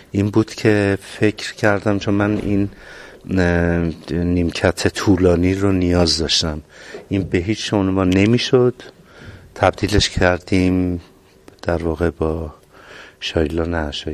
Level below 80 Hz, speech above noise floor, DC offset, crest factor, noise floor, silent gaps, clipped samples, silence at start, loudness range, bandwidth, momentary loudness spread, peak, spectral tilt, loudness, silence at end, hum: -32 dBFS; 29 dB; under 0.1%; 18 dB; -47 dBFS; none; under 0.1%; 0.15 s; 3 LU; 13.5 kHz; 12 LU; 0 dBFS; -5.5 dB/octave; -18 LUFS; 0 s; none